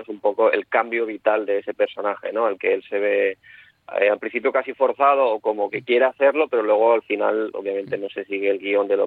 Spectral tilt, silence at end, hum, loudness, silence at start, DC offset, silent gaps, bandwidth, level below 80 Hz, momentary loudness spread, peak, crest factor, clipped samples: -7 dB/octave; 0 s; none; -21 LUFS; 0 s; under 0.1%; none; 4.4 kHz; -74 dBFS; 9 LU; -4 dBFS; 16 dB; under 0.1%